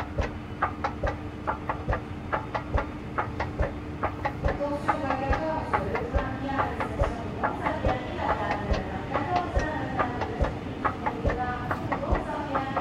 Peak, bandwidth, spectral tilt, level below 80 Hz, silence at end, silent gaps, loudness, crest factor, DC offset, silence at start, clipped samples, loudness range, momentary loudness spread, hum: -10 dBFS; 11 kHz; -7 dB/octave; -38 dBFS; 0 s; none; -30 LUFS; 18 dB; under 0.1%; 0 s; under 0.1%; 3 LU; 5 LU; none